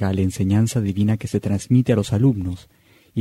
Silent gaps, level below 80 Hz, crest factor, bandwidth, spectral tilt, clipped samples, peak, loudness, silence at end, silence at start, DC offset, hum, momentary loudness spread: none; -48 dBFS; 14 dB; 14.5 kHz; -7.5 dB/octave; under 0.1%; -6 dBFS; -20 LUFS; 0 s; 0 s; under 0.1%; none; 10 LU